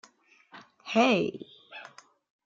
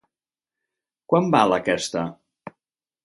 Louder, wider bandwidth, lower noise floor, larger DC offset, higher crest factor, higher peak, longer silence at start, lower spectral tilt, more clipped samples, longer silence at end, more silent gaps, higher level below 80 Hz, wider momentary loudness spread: second, -26 LUFS vs -21 LUFS; second, 7.6 kHz vs 11.5 kHz; second, -60 dBFS vs under -90 dBFS; neither; about the same, 22 dB vs 22 dB; second, -10 dBFS vs -4 dBFS; second, 0.55 s vs 1.1 s; about the same, -5 dB/octave vs -5 dB/octave; neither; about the same, 0.6 s vs 0.55 s; neither; second, -74 dBFS vs -62 dBFS; first, 23 LU vs 14 LU